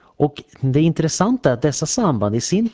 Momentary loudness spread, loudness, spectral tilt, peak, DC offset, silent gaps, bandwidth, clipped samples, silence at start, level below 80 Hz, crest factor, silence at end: 5 LU; -19 LUFS; -5.5 dB/octave; -4 dBFS; under 0.1%; none; 8 kHz; under 0.1%; 0.2 s; -46 dBFS; 14 dB; 0.05 s